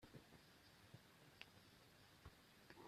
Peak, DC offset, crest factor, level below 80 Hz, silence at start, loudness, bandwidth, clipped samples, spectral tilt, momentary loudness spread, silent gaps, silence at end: -36 dBFS; under 0.1%; 30 dB; -80 dBFS; 0 s; -66 LUFS; 14.5 kHz; under 0.1%; -4 dB/octave; 5 LU; none; 0 s